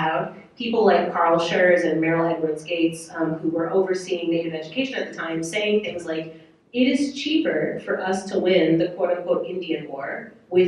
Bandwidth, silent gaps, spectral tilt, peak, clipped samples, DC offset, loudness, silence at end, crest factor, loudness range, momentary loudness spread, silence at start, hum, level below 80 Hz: 12 kHz; none; -5.5 dB/octave; -4 dBFS; under 0.1%; under 0.1%; -23 LUFS; 0 s; 18 dB; 4 LU; 11 LU; 0 s; none; -64 dBFS